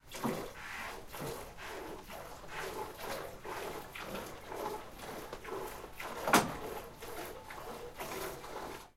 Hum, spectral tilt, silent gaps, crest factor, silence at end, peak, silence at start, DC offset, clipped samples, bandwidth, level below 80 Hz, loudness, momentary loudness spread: none; -3.5 dB/octave; none; 30 dB; 0.05 s; -10 dBFS; 0.05 s; under 0.1%; under 0.1%; 16 kHz; -58 dBFS; -40 LUFS; 7 LU